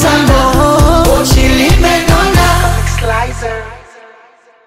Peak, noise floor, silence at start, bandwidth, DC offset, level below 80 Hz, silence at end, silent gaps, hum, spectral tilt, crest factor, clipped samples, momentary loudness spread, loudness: 0 dBFS; -43 dBFS; 0 s; 16.5 kHz; under 0.1%; -14 dBFS; 0.9 s; none; none; -5 dB/octave; 10 dB; under 0.1%; 10 LU; -10 LUFS